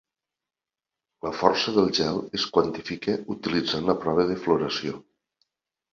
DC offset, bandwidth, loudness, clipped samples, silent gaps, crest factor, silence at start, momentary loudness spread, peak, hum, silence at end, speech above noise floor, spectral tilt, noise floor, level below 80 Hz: under 0.1%; 7.4 kHz; -25 LUFS; under 0.1%; none; 24 dB; 1.25 s; 8 LU; -2 dBFS; none; 0.9 s; 65 dB; -5 dB/octave; -90 dBFS; -58 dBFS